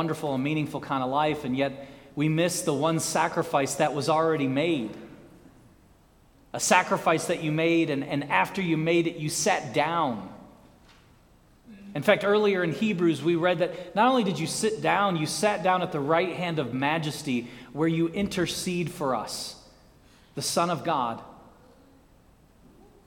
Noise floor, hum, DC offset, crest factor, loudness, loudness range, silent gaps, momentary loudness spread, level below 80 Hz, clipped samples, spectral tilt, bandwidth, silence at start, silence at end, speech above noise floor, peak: -58 dBFS; none; under 0.1%; 24 dB; -26 LUFS; 5 LU; none; 8 LU; -60 dBFS; under 0.1%; -4.5 dB/octave; 19 kHz; 0 s; 1.65 s; 32 dB; -4 dBFS